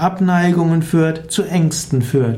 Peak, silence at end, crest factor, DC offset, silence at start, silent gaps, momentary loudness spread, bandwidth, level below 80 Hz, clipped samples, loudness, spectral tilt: -4 dBFS; 0 s; 12 dB; under 0.1%; 0 s; none; 4 LU; 15.5 kHz; -46 dBFS; under 0.1%; -16 LUFS; -6 dB/octave